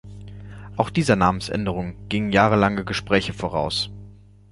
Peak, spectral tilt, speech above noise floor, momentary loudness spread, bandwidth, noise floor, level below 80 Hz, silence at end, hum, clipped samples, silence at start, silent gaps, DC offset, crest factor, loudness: -2 dBFS; -5.5 dB/octave; 24 dB; 19 LU; 11.5 kHz; -45 dBFS; -42 dBFS; 0.4 s; 50 Hz at -35 dBFS; under 0.1%; 0.05 s; none; under 0.1%; 20 dB; -22 LUFS